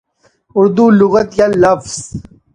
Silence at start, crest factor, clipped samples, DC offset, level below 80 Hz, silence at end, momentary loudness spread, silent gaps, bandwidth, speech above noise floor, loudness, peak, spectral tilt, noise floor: 0.55 s; 12 dB; under 0.1%; under 0.1%; -44 dBFS; 0.35 s; 15 LU; none; 10.5 kHz; 43 dB; -11 LUFS; 0 dBFS; -6 dB/octave; -54 dBFS